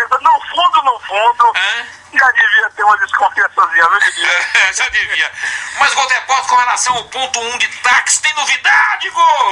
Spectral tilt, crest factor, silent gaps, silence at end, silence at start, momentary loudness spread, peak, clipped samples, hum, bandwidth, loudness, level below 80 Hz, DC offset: 1.5 dB/octave; 12 dB; none; 0 s; 0 s; 6 LU; 0 dBFS; under 0.1%; none; 11.5 kHz; -12 LUFS; -54 dBFS; under 0.1%